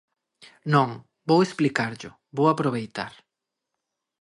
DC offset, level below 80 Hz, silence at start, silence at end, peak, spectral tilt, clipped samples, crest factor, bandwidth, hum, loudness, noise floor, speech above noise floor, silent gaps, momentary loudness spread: under 0.1%; -68 dBFS; 0.65 s; 1.1 s; -6 dBFS; -6.5 dB/octave; under 0.1%; 20 dB; 11.5 kHz; none; -24 LUFS; -84 dBFS; 61 dB; none; 15 LU